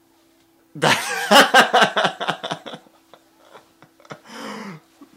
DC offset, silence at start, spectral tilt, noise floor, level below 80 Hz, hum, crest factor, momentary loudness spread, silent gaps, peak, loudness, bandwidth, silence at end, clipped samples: under 0.1%; 0.75 s; -2.5 dB/octave; -58 dBFS; -68 dBFS; none; 22 dB; 24 LU; none; 0 dBFS; -16 LUFS; 16 kHz; 0.4 s; under 0.1%